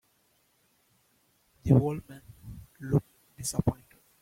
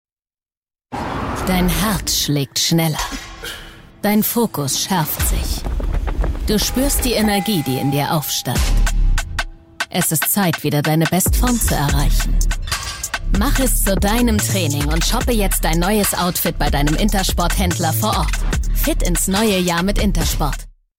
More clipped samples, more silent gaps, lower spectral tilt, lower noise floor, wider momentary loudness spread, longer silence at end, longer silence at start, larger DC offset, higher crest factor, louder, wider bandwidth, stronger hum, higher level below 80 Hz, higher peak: neither; neither; first, -7 dB/octave vs -4 dB/octave; second, -70 dBFS vs under -90 dBFS; first, 24 LU vs 8 LU; first, 0.5 s vs 0.3 s; first, 1.65 s vs 0.9 s; neither; first, 24 dB vs 10 dB; second, -29 LUFS vs -18 LUFS; about the same, 16.5 kHz vs 16.5 kHz; neither; second, -52 dBFS vs -22 dBFS; about the same, -8 dBFS vs -6 dBFS